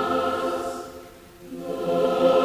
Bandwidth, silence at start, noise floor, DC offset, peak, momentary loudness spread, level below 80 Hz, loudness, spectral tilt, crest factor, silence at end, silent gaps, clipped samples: 16 kHz; 0 s; -45 dBFS; under 0.1%; -8 dBFS; 23 LU; -56 dBFS; -25 LUFS; -5.5 dB/octave; 16 dB; 0 s; none; under 0.1%